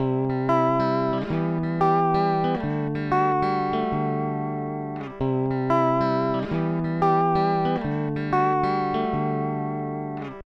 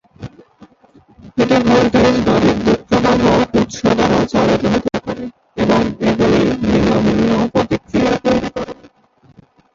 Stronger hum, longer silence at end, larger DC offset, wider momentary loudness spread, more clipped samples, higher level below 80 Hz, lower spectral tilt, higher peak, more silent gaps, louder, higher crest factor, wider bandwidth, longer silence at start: neither; second, 0.05 s vs 1 s; neither; second, 8 LU vs 13 LU; neither; second, -50 dBFS vs -36 dBFS; first, -9 dB/octave vs -6 dB/octave; second, -8 dBFS vs 0 dBFS; neither; second, -24 LUFS vs -14 LUFS; about the same, 16 dB vs 14 dB; second, 6.4 kHz vs 7.6 kHz; second, 0 s vs 0.2 s